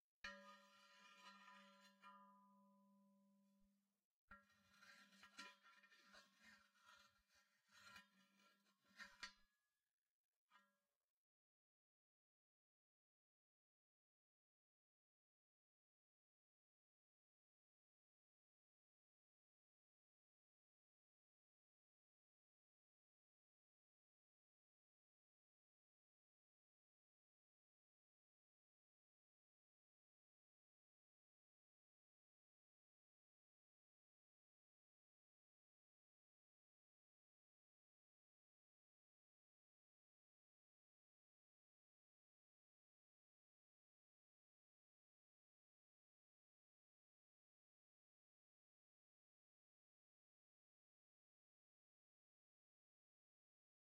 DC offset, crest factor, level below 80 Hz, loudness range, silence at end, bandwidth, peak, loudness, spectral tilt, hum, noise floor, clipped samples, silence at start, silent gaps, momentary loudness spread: under 0.1%; 36 dB; under -90 dBFS; 3 LU; 43.2 s; 8.2 kHz; -40 dBFS; -64 LUFS; -1.5 dB/octave; none; under -90 dBFS; under 0.1%; 0.25 s; 4.05-4.28 s, 9.93-10.02 s, 10.10-10.48 s; 10 LU